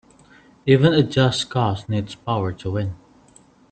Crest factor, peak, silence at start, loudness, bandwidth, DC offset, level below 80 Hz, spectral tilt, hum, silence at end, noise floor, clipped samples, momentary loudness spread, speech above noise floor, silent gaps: 20 dB; -2 dBFS; 0.65 s; -21 LUFS; 9 kHz; under 0.1%; -52 dBFS; -6.5 dB/octave; none; 0.75 s; -52 dBFS; under 0.1%; 11 LU; 33 dB; none